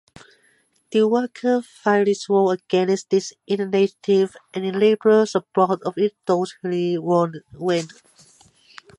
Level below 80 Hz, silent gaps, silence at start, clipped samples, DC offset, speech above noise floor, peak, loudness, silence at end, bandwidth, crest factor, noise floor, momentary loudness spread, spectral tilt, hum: -70 dBFS; none; 0.9 s; under 0.1%; under 0.1%; 42 dB; -4 dBFS; -21 LUFS; 1.1 s; 11 kHz; 16 dB; -62 dBFS; 7 LU; -6 dB/octave; none